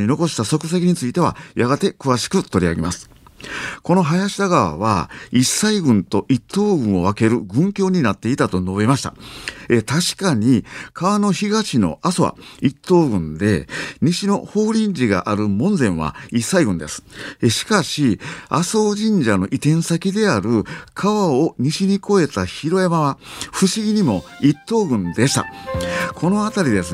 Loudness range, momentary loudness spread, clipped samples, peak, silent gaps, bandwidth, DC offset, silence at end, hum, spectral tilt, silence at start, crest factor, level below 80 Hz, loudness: 2 LU; 6 LU; under 0.1%; -2 dBFS; none; 15.5 kHz; under 0.1%; 0 s; none; -5.5 dB/octave; 0 s; 16 dB; -46 dBFS; -18 LUFS